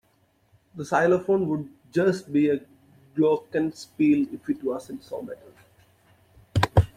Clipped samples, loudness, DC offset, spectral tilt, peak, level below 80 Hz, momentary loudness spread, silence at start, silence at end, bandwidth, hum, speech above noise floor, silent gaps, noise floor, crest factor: under 0.1%; -25 LUFS; under 0.1%; -7.5 dB/octave; -2 dBFS; -46 dBFS; 15 LU; 0.75 s; 0.1 s; 14 kHz; none; 41 dB; none; -65 dBFS; 22 dB